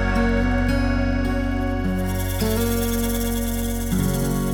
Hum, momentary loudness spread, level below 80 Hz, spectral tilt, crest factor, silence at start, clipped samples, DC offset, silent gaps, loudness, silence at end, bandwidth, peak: none; 4 LU; -26 dBFS; -5.5 dB/octave; 14 dB; 0 s; under 0.1%; under 0.1%; none; -23 LUFS; 0 s; over 20 kHz; -8 dBFS